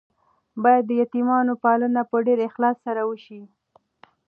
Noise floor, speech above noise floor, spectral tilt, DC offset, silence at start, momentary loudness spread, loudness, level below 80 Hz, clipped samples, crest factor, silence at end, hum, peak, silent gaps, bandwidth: -56 dBFS; 35 dB; -9 dB/octave; under 0.1%; 0.55 s; 8 LU; -21 LUFS; -80 dBFS; under 0.1%; 18 dB; 0.8 s; none; -4 dBFS; none; 4.3 kHz